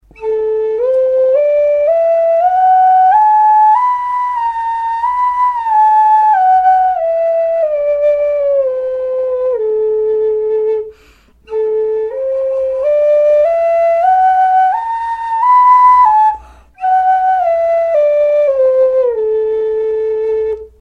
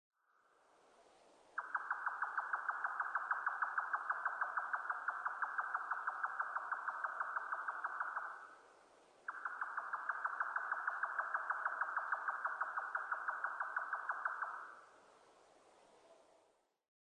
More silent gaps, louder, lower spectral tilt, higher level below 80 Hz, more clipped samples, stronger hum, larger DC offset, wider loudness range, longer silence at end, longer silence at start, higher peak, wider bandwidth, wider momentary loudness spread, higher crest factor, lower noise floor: neither; first, -12 LUFS vs -41 LUFS; first, -4.5 dB/octave vs -1.5 dB/octave; first, -50 dBFS vs under -90 dBFS; neither; neither; neither; about the same, 6 LU vs 4 LU; second, 0.15 s vs 0.9 s; second, 0.2 s vs 1 s; first, 0 dBFS vs -26 dBFS; second, 6.4 kHz vs 10 kHz; first, 9 LU vs 6 LU; second, 10 dB vs 18 dB; second, -46 dBFS vs -76 dBFS